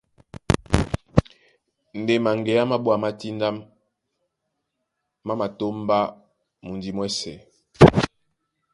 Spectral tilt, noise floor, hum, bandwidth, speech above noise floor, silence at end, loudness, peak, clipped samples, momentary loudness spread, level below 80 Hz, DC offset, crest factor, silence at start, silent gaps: -6.5 dB/octave; -79 dBFS; none; 11.5 kHz; 55 dB; 0.65 s; -22 LUFS; 0 dBFS; under 0.1%; 19 LU; -40 dBFS; under 0.1%; 24 dB; 0.5 s; none